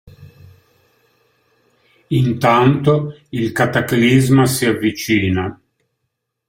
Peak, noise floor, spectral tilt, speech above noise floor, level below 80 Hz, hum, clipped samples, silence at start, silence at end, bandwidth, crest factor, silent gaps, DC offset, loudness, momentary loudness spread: 0 dBFS; -75 dBFS; -6 dB/octave; 60 dB; -50 dBFS; none; under 0.1%; 0.2 s; 0.95 s; 16.5 kHz; 16 dB; none; under 0.1%; -16 LUFS; 9 LU